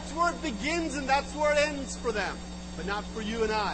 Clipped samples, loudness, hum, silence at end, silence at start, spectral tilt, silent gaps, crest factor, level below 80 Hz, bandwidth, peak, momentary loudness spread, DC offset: under 0.1%; -30 LUFS; none; 0 s; 0 s; -4 dB/octave; none; 18 dB; -44 dBFS; 8.8 kHz; -12 dBFS; 8 LU; under 0.1%